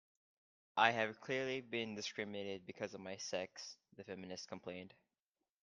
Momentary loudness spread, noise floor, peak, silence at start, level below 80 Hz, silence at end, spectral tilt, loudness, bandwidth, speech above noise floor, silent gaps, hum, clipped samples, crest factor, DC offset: 18 LU; under -90 dBFS; -14 dBFS; 0.75 s; -86 dBFS; 0.75 s; -3.5 dB/octave; -41 LUFS; 10.5 kHz; over 48 dB; none; none; under 0.1%; 30 dB; under 0.1%